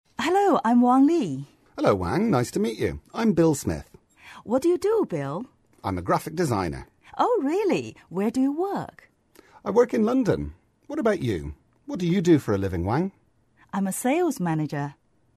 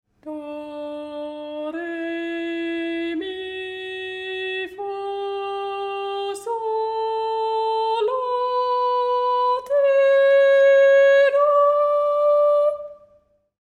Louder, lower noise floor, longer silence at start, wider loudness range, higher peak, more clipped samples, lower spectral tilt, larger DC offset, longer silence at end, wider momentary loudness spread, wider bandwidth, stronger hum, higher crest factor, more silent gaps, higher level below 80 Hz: second, -24 LUFS vs -20 LUFS; about the same, -61 dBFS vs -59 dBFS; about the same, 0.2 s vs 0.25 s; second, 4 LU vs 12 LU; about the same, -8 dBFS vs -8 dBFS; neither; first, -6.5 dB/octave vs -3 dB/octave; neither; second, 0.45 s vs 0.65 s; about the same, 15 LU vs 17 LU; first, 13.5 kHz vs 9.4 kHz; neither; first, 18 dB vs 12 dB; neither; first, -50 dBFS vs -66 dBFS